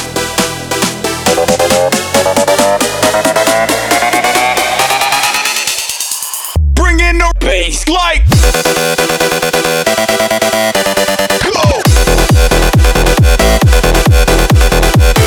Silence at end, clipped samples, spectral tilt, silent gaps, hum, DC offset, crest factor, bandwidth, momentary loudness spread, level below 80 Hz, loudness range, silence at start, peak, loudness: 0 s; under 0.1%; -3.5 dB/octave; none; none; under 0.1%; 10 dB; over 20 kHz; 5 LU; -14 dBFS; 2 LU; 0 s; 0 dBFS; -10 LUFS